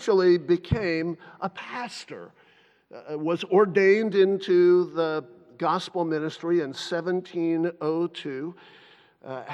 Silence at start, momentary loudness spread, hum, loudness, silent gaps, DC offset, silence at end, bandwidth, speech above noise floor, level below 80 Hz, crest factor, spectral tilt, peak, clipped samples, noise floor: 0 s; 16 LU; none; -25 LUFS; none; under 0.1%; 0 s; 8.8 kHz; 35 dB; -54 dBFS; 18 dB; -6.5 dB/octave; -8 dBFS; under 0.1%; -60 dBFS